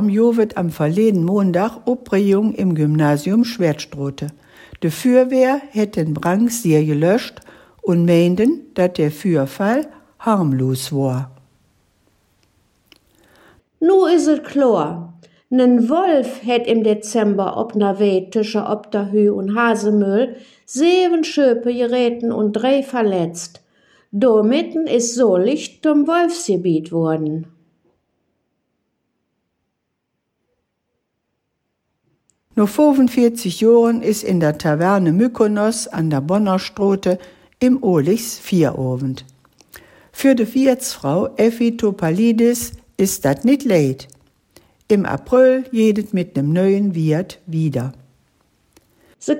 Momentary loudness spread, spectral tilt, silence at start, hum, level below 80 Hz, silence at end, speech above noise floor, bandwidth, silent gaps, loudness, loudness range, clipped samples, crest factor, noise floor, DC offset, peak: 8 LU; -6 dB/octave; 0 s; none; -56 dBFS; 0 s; 58 dB; 17 kHz; none; -17 LUFS; 4 LU; under 0.1%; 16 dB; -74 dBFS; under 0.1%; -2 dBFS